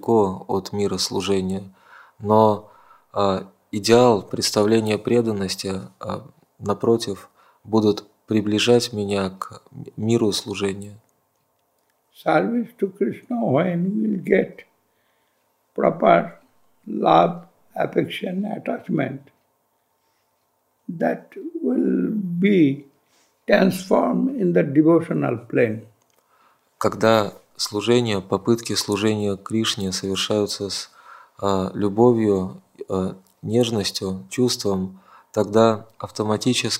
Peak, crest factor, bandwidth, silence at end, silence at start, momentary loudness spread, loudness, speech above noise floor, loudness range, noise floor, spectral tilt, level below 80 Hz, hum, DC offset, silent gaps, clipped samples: 0 dBFS; 22 dB; 16 kHz; 0 s; 0.05 s; 15 LU; -21 LUFS; 48 dB; 5 LU; -68 dBFS; -5.5 dB/octave; -64 dBFS; none; under 0.1%; none; under 0.1%